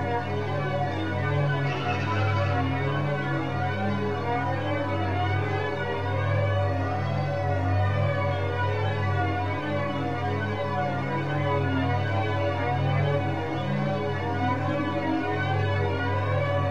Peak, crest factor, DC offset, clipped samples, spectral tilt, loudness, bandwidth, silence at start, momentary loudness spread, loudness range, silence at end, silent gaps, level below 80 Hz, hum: -14 dBFS; 12 dB; 0.9%; under 0.1%; -7.5 dB/octave; -27 LUFS; 7 kHz; 0 s; 3 LU; 1 LU; 0 s; none; -54 dBFS; none